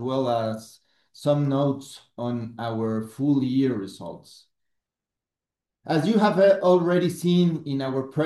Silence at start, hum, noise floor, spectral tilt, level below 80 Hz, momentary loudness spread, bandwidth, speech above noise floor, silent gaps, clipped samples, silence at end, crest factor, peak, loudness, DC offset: 0 s; none; -89 dBFS; -7.5 dB/octave; -70 dBFS; 15 LU; 12.5 kHz; 66 dB; none; under 0.1%; 0 s; 16 dB; -8 dBFS; -23 LUFS; under 0.1%